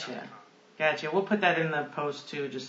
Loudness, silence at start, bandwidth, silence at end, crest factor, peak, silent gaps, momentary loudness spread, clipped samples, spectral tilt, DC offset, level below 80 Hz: -29 LUFS; 0 s; 8 kHz; 0 s; 22 dB; -10 dBFS; none; 13 LU; under 0.1%; -5.5 dB/octave; under 0.1%; -84 dBFS